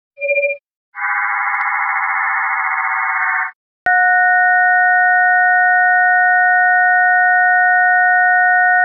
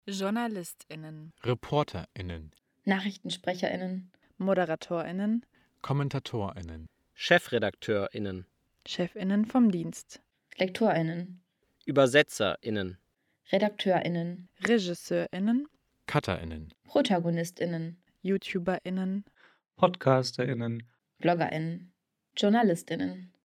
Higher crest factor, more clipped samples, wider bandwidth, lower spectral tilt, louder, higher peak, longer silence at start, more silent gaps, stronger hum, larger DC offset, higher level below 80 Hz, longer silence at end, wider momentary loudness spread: second, 10 dB vs 24 dB; neither; second, 2.6 kHz vs 16 kHz; second, 1.5 dB/octave vs -6 dB/octave; first, -12 LUFS vs -30 LUFS; about the same, -4 dBFS vs -6 dBFS; first, 0.2 s vs 0.05 s; first, 0.76-0.92 s, 3.55-3.86 s vs none; neither; neither; second, -72 dBFS vs -60 dBFS; second, 0 s vs 0.25 s; second, 7 LU vs 17 LU